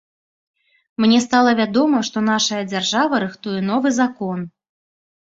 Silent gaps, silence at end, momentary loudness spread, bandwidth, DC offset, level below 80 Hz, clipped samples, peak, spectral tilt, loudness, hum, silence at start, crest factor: none; 0.85 s; 11 LU; 8 kHz; under 0.1%; -62 dBFS; under 0.1%; -2 dBFS; -4 dB/octave; -18 LUFS; none; 1 s; 18 dB